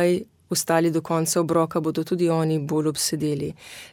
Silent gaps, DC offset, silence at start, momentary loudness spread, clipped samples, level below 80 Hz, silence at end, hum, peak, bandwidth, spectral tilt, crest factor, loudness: none; under 0.1%; 0 s; 6 LU; under 0.1%; -62 dBFS; 0.05 s; none; -8 dBFS; 17.5 kHz; -5 dB/octave; 16 dB; -23 LUFS